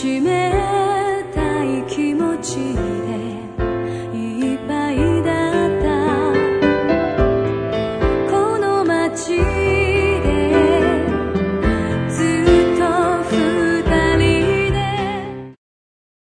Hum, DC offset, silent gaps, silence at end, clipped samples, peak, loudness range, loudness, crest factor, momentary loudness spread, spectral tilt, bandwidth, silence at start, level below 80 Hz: none; under 0.1%; none; 0.75 s; under 0.1%; -2 dBFS; 5 LU; -18 LUFS; 16 dB; 8 LU; -6 dB/octave; 10.5 kHz; 0 s; -30 dBFS